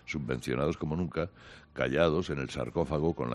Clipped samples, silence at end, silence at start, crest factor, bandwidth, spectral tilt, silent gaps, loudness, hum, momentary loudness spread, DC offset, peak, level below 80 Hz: under 0.1%; 0 s; 0.05 s; 18 dB; 12.5 kHz; -6.5 dB/octave; none; -32 LUFS; none; 8 LU; under 0.1%; -12 dBFS; -52 dBFS